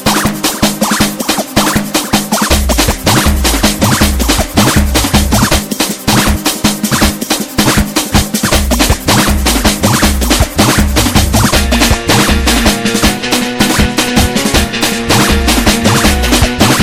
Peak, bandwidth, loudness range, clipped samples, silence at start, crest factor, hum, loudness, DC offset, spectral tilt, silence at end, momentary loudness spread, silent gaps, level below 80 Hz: 0 dBFS; 17.5 kHz; 1 LU; 0.3%; 0 s; 10 dB; none; -10 LUFS; under 0.1%; -3.5 dB/octave; 0 s; 3 LU; none; -18 dBFS